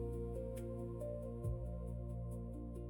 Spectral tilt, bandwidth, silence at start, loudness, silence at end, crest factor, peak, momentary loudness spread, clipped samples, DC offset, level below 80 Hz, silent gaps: -9.5 dB/octave; 17 kHz; 0 s; -46 LUFS; 0 s; 12 dB; -32 dBFS; 3 LU; under 0.1%; under 0.1%; -48 dBFS; none